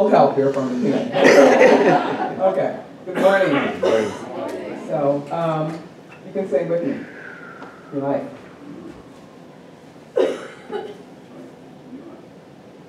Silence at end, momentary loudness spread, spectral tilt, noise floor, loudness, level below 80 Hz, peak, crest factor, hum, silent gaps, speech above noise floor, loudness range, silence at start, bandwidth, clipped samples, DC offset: 0.05 s; 26 LU; -5.5 dB/octave; -43 dBFS; -18 LUFS; -66 dBFS; 0 dBFS; 20 dB; none; none; 26 dB; 14 LU; 0 s; 13 kHz; under 0.1%; under 0.1%